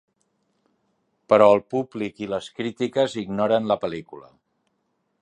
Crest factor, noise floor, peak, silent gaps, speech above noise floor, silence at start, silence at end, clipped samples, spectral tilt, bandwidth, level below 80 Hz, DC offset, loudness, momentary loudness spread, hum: 22 dB; -73 dBFS; -2 dBFS; none; 51 dB; 1.3 s; 1 s; under 0.1%; -6 dB/octave; 9.8 kHz; -64 dBFS; under 0.1%; -22 LUFS; 14 LU; none